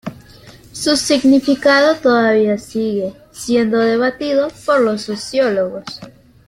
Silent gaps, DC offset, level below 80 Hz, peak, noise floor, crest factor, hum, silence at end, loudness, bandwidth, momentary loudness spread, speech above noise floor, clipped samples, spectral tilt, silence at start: none; under 0.1%; -52 dBFS; 0 dBFS; -41 dBFS; 16 dB; none; 0.4 s; -15 LUFS; 15.5 kHz; 15 LU; 26 dB; under 0.1%; -4 dB/octave; 0.05 s